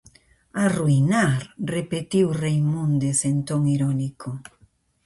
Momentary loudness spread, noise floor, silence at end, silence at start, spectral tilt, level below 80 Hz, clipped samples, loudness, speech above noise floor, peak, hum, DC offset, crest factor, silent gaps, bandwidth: 11 LU; -60 dBFS; 0.65 s; 0.55 s; -6 dB/octave; -54 dBFS; under 0.1%; -22 LUFS; 38 dB; -8 dBFS; none; under 0.1%; 14 dB; none; 11.5 kHz